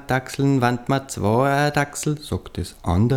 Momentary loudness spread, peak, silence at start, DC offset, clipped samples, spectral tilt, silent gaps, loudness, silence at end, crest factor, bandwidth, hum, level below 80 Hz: 10 LU; -4 dBFS; 0 s; under 0.1%; under 0.1%; -6 dB/octave; none; -22 LUFS; 0 s; 16 dB; 16.5 kHz; none; -44 dBFS